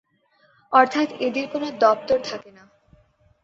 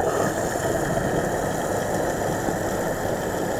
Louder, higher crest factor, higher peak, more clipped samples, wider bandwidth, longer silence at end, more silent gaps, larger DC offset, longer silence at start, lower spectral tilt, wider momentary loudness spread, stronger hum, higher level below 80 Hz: first, -21 LUFS vs -25 LUFS; first, 22 dB vs 14 dB; first, -2 dBFS vs -10 dBFS; neither; second, 7.8 kHz vs over 20 kHz; first, 1 s vs 0 s; neither; neither; first, 0.7 s vs 0 s; about the same, -4 dB/octave vs -5 dB/octave; first, 11 LU vs 2 LU; neither; second, -64 dBFS vs -42 dBFS